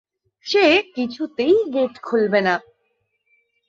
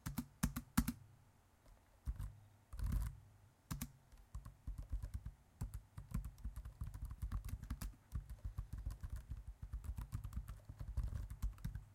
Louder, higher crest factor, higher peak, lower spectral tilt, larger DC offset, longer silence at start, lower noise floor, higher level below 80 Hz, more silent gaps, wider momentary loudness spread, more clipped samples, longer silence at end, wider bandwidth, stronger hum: first, -19 LUFS vs -49 LUFS; second, 16 dB vs 28 dB; first, -4 dBFS vs -20 dBFS; about the same, -5 dB/octave vs -5.5 dB/octave; neither; first, 0.45 s vs 0.05 s; about the same, -70 dBFS vs -70 dBFS; second, -66 dBFS vs -50 dBFS; neither; about the same, 11 LU vs 13 LU; neither; first, 1.1 s vs 0 s; second, 7.6 kHz vs 16.5 kHz; neither